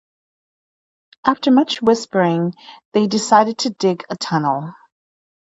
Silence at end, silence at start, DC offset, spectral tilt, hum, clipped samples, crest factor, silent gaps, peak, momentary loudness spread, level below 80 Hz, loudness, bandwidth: 0.7 s; 1.25 s; under 0.1%; -5 dB/octave; none; under 0.1%; 18 dB; 2.85-2.92 s; 0 dBFS; 9 LU; -64 dBFS; -17 LUFS; 8 kHz